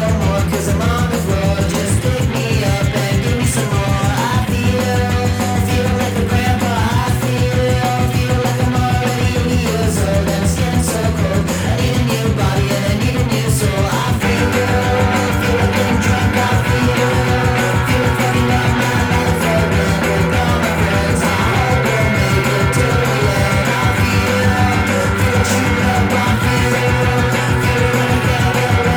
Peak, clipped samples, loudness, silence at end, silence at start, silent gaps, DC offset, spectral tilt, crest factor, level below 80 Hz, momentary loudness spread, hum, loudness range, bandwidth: -4 dBFS; under 0.1%; -15 LUFS; 0 s; 0 s; none; under 0.1%; -5.5 dB/octave; 10 dB; -26 dBFS; 2 LU; none; 2 LU; over 20 kHz